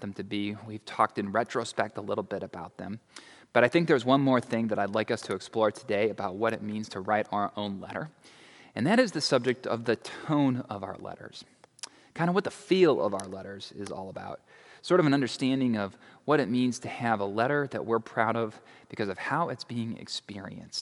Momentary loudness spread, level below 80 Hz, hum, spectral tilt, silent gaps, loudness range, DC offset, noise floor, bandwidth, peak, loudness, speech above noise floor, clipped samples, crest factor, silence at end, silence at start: 17 LU; -74 dBFS; none; -5.5 dB/octave; none; 4 LU; under 0.1%; -48 dBFS; 11.5 kHz; -6 dBFS; -29 LUFS; 19 dB; under 0.1%; 24 dB; 0 s; 0 s